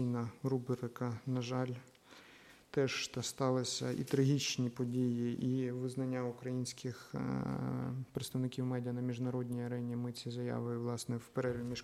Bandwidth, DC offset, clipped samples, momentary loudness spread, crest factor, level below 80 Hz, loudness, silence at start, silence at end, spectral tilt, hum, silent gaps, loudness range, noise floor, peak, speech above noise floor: 15 kHz; under 0.1%; under 0.1%; 7 LU; 18 dB; -70 dBFS; -38 LUFS; 0 s; 0 s; -5.5 dB/octave; none; none; 4 LU; -60 dBFS; -20 dBFS; 23 dB